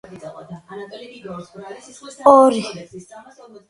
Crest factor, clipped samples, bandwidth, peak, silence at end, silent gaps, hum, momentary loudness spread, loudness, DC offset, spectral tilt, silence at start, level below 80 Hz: 20 dB; under 0.1%; 11 kHz; 0 dBFS; 0.7 s; none; none; 26 LU; -14 LUFS; under 0.1%; -5.5 dB/octave; 0.15 s; -62 dBFS